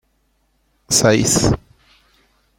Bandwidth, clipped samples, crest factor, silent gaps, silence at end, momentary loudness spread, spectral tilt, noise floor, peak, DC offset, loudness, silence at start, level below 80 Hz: 16.5 kHz; under 0.1%; 18 dB; none; 1 s; 7 LU; -3.5 dB/octave; -64 dBFS; -2 dBFS; under 0.1%; -15 LUFS; 0.9 s; -38 dBFS